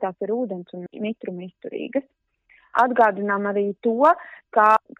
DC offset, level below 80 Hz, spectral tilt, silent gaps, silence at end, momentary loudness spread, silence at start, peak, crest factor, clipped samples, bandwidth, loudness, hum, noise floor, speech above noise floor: under 0.1%; -72 dBFS; -7.5 dB/octave; none; 0.2 s; 16 LU; 0 s; -4 dBFS; 18 dB; under 0.1%; 9.2 kHz; -22 LUFS; none; -57 dBFS; 35 dB